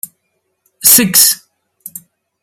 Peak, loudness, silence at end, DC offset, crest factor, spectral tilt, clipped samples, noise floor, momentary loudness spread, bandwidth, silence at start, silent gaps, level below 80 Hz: 0 dBFS; -8 LUFS; 1.05 s; under 0.1%; 14 dB; -1 dB/octave; 0.7%; -67 dBFS; 25 LU; over 20 kHz; 0.85 s; none; -58 dBFS